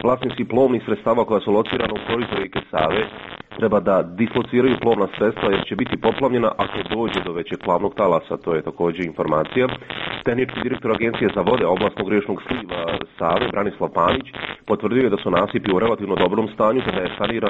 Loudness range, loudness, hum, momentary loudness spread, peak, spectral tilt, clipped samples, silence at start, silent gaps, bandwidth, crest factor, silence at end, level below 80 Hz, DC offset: 2 LU; -21 LUFS; none; 6 LU; -4 dBFS; -8 dB/octave; under 0.1%; 0 s; none; 7.8 kHz; 16 dB; 0 s; -48 dBFS; under 0.1%